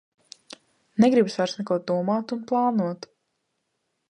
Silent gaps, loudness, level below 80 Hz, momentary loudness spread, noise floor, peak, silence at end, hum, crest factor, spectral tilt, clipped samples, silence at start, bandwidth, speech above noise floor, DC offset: none; -24 LUFS; -74 dBFS; 17 LU; -77 dBFS; -8 dBFS; 1.15 s; none; 18 dB; -6.5 dB/octave; under 0.1%; 0.95 s; 10.5 kHz; 54 dB; under 0.1%